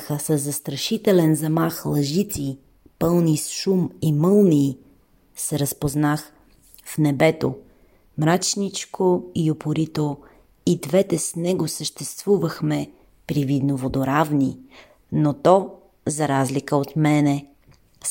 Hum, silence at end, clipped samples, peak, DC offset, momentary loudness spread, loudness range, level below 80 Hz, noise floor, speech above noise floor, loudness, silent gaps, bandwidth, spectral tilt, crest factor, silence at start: none; 0 s; under 0.1%; -2 dBFS; under 0.1%; 11 LU; 3 LU; -54 dBFS; -56 dBFS; 35 dB; -22 LUFS; none; 16.5 kHz; -5.5 dB/octave; 20 dB; 0 s